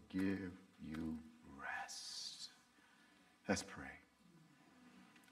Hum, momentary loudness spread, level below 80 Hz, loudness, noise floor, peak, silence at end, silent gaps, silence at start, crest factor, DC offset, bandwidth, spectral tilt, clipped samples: none; 25 LU; -72 dBFS; -47 LUFS; -70 dBFS; -24 dBFS; 0 s; none; 0 s; 24 dB; under 0.1%; 15.5 kHz; -4 dB/octave; under 0.1%